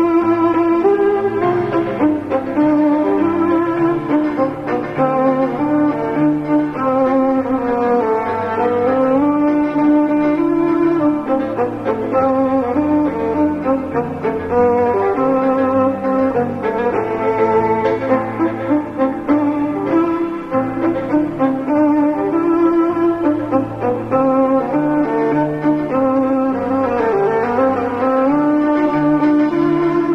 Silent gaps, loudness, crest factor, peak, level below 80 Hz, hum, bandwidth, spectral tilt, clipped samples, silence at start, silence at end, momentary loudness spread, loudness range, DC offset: none; -16 LUFS; 14 dB; -2 dBFS; -48 dBFS; none; 6 kHz; -9 dB/octave; under 0.1%; 0 s; 0 s; 5 LU; 2 LU; under 0.1%